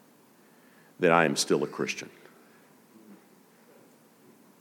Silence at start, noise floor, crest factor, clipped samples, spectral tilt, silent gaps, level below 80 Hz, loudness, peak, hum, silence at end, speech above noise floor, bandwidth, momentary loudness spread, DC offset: 1 s; -59 dBFS; 24 dB; under 0.1%; -4 dB/octave; none; -82 dBFS; -26 LUFS; -8 dBFS; none; 1.45 s; 33 dB; 19 kHz; 14 LU; under 0.1%